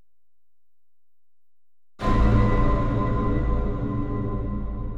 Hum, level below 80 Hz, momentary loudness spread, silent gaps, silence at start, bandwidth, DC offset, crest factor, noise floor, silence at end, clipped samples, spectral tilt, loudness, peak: none; -26 dBFS; 9 LU; none; 2 s; 7 kHz; under 0.1%; 16 dB; under -90 dBFS; 0 s; under 0.1%; -9 dB/octave; -25 LUFS; -8 dBFS